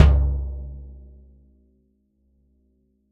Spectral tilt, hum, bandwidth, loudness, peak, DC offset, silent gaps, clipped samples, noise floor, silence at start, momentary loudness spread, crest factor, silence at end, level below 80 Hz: -7.5 dB/octave; none; 4.7 kHz; -24 LUFS; 0 dBFS; under 0.1%; none; under 0.1%; -66 dBFS; 0 s; 27 LU; 24 dB; 2.15 s; -26 dBFS